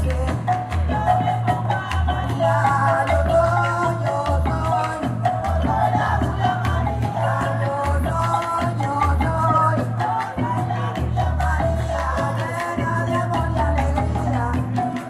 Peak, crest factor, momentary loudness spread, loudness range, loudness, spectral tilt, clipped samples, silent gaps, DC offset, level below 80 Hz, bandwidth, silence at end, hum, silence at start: -6 dBFS; 14 dB; 5 LU; 2 LU; -21 LUFS; -7 dB/octave; under 0.1%; none; under 0.1%; -28 dBFS; 12.5 kHz; 0 s; none; 0 s